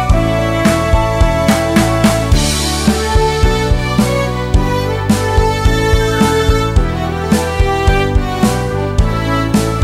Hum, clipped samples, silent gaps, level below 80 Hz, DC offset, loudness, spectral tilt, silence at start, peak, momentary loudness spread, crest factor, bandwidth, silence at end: none; under 0.1%; none; -18 dBFS; under 0.1%; -13 LUFS; -5.5 dB/octave; 0 s; 0 dBFS; 3 LU; 12 dB; 16 kHz; 0 s